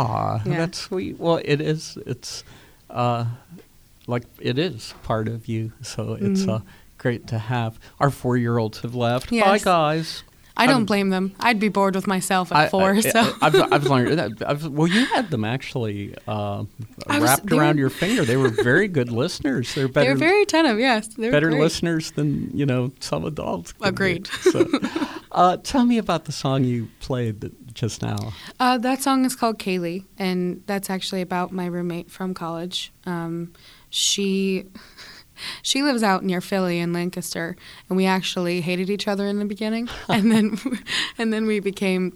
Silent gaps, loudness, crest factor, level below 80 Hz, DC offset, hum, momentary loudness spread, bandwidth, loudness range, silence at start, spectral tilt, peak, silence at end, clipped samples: none; -22 LUFS; 20 dB; -52 dBFS; under 0.1%; none; 12 LU; over 20 kHz; 7 LU; 0 s; -5 dB/octave; -2 dBFS; 0.05 s; under 0.1%